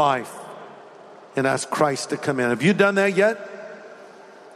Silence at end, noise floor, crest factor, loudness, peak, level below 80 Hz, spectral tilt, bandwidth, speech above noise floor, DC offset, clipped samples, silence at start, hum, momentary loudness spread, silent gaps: 0 s; -45 dBFS; 20 dB; -21 LUFS; -4 dBFS; -68 dBFS; -5 dB/octave; 15 kHz; 24 dB; under 0.1%; under 0.1%; 0 s; none; 22 LU; none